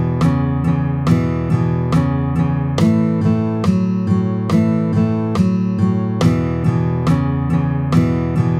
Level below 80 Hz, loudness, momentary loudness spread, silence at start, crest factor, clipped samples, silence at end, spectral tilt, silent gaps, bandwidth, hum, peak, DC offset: -34 dBFS; -17 LUFS; 2 LU; 0 s; 14 dB; under 0.1%; 0 s; -8.5 dB/octave; none; 10.5 kHz; none; -2 dBFS; under 0.1%